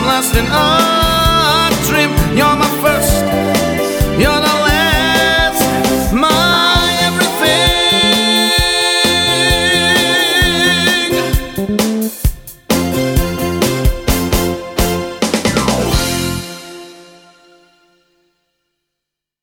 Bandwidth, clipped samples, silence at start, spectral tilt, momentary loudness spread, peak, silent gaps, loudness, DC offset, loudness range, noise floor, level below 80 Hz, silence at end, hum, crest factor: over 20 kHz; under 0.1%; 0 s; -3.5 dB/octave; 7 LU; 0 dBFS; none; -12 LUFS; under 0.1%; 7 LU; -80 dBFS; -24 dBFS; 2.4 s; none; 14 dB